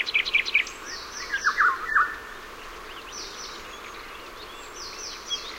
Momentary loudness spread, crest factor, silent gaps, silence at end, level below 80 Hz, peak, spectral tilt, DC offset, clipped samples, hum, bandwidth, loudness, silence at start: 18 LU; 20 dB; none; 0 s; -52 dBFS; -10 dBFS; 0 dB/octave; under 0.1%; under 0.1%; none; 16 kHz; -26 LUFS; 0 s